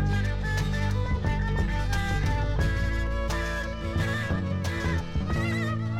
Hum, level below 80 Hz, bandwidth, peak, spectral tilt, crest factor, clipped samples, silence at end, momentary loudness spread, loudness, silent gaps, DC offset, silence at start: none; -32 dBFS; 14.5 kHz; -14 dBFS; -6 dB/octave; 14 dB; under 0.1%; 0 s; 2 LU; -28 LUFS; none; under 0.1%; 0 s